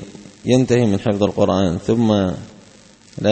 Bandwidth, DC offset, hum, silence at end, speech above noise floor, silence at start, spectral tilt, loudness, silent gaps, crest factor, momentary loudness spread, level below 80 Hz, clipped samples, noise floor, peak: 8.8 kHz; under 0.1%; none; 0 s; 30 dB; 0 s; -7 dB/octave; -18 LUFS; none; 16 dB; 15 LU; -48 dBFS; under 0.1%; -46 dBFS; -2 dBFS